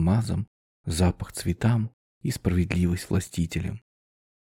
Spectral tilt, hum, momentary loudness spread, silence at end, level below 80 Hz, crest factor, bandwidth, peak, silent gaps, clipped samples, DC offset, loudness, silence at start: -6.5 dB/octave; none; 11 LU; 0.7 s; -42 dBFS; 16 dB; 16.5 kHz; -10 dBFS; 0.47-0.84 s, 1.93-2.21 s; under 0.1%; under 0.1%; -27 LUFS; 0 s